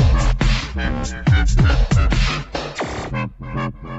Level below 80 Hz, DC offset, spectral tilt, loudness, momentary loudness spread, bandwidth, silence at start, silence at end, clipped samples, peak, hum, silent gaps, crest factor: -20 dBFS; under 0.1%; -5.5 dB/octave; -20 LUFS; 10 LU; 8.2 kHz; 0 s; 0 s; under 0.1%; -4 dBFS; none; none; 14 dB